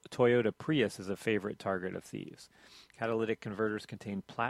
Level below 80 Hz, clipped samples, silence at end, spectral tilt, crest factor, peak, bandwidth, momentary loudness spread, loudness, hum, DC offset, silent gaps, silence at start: -70 dBFS; under 0.1%; 0 s; -6 dB/octave; 20 dB; -14 dBFS; 14 kHz; 17 LU; -34 LUFS; none; under 0.1%; none; 0.1 s